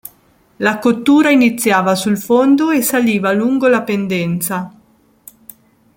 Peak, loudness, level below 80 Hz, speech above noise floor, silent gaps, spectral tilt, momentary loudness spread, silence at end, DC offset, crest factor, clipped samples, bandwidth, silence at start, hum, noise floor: 0 dBFS; -14 LUFS; -58 dBFS; 39 dB; none; -5 dB/octave; 7 LU; 1.25 s; under 0.1%; 14 dB; under 0.1%; 17 kHz; 0.6 s; none; -52 dBFS